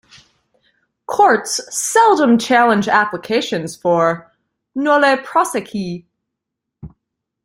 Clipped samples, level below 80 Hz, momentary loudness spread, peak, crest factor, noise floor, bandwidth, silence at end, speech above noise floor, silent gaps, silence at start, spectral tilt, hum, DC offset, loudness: under 0.1%; -58 dBFS; 13 LU; 0 dBFS; 18 dB; -80 dBFS; 16.5 kHz; 0.6 s; 65 dB; none; 1.1 s; -3.5 dB/octave; none; under 0.1%; -15 LUFS